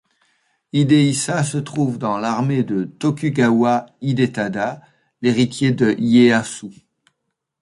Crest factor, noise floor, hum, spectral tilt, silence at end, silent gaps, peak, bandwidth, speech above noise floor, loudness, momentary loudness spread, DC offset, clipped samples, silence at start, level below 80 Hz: 16 dB; -76 dBFS; none; -6 dB/octave; 0.9 s; none; -2 dBFS; 11.5 kHz; 59 dB; -18 LUFS; 9 LU; under 0.1%; under 0.1%; 0.75 s; -58 dBFS